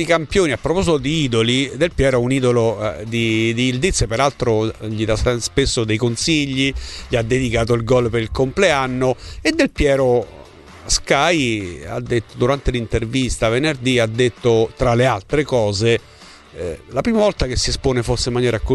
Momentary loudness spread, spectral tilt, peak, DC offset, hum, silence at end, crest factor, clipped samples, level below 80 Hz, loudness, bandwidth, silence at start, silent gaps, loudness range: 6 LU; -5 dB/octave; 0 dBFS; under 0.1%; none; 0 s; 16 dB; under 0.1%; -32 dBFS; -18 LUFS; 12 kHz; 0 s; none; 2 LU